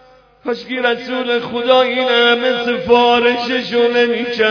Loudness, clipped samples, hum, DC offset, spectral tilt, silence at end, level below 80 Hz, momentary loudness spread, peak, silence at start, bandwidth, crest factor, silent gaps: -14 LUFS; under 0.1%; none; under 0.1%; -4.5 dB/octave; 0 s; -54 dBFS; 8 LU; 0 dBFS; 0.45 s; 5.4 kHz; 14 dB; none